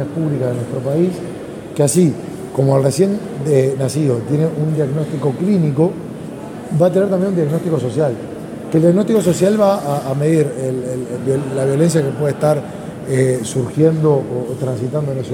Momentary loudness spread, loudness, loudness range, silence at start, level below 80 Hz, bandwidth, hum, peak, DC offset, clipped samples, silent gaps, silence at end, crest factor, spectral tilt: 10 LU; -17 LUFS; 2 LU; 0 s; -52 dBFS; 16.5 kHz; none; 0 dBFS; under 0.1%; under 0.1%; none; 0 s; 16 dB; -7 dB/octave